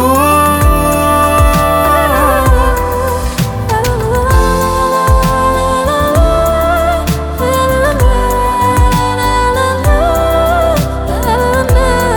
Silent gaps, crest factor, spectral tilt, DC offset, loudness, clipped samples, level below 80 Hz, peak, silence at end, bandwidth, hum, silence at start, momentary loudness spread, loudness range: none; 10 dB; -5.5 dB/octave; under 0.1%; -11 LUFS; under 0.1%; -16 dBFS; 0 dBFS; 0 s; 19 kHz; none; 0 s; 5 LU; 1 LU